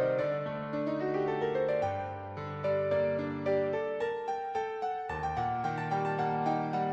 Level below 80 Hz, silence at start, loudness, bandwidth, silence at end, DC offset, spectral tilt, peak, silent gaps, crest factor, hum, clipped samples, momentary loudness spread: -60 dBFS; 0 s; -33 LUFS; 8 kHz; 0 s; under 0.1%; -7.5 dB/octave; -18 dBFS; none; 14 dB; none; under 0.1%; 5 LU